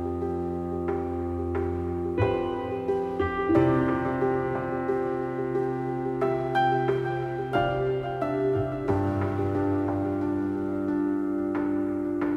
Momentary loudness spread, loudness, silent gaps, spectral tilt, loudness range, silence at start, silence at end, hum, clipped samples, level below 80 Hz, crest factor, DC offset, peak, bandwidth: 6 LU; -27 LUFS; none; -9 dB/octave; 1 LU; 0 s; 0 s; none; under 0.1%; -48 dBFS; 16 dB; under 0.1%; -10 dBFS; 8.2 kHz